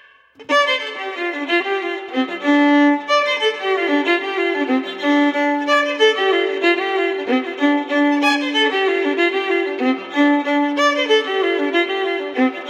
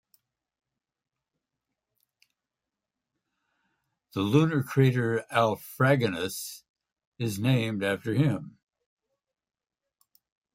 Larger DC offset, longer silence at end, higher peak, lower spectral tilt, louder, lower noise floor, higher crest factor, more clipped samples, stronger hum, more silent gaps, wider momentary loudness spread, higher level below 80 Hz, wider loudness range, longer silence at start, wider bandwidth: neither; second, 0 s vs 2.05 s; first, -2 dBFS vs -8 dBFS; second, -2 dB/octave vs -6.5 dB/octave; first, -17 LUFS vs -27 LUFS; second, -41 dBFS vs -88 dBFS; second, 16 dB vs 22 dB; neither; neither; second, none vs 6.69-6.74 s, 7.07-7.12 s; second, 6 LU vs 12 LU; second, -78 dBFS vs -68 dBFS; second, 1 LU vs 5 LU; second, 0.4 s vs 4.15 s; second, 9.8 kHz vs 16 kHz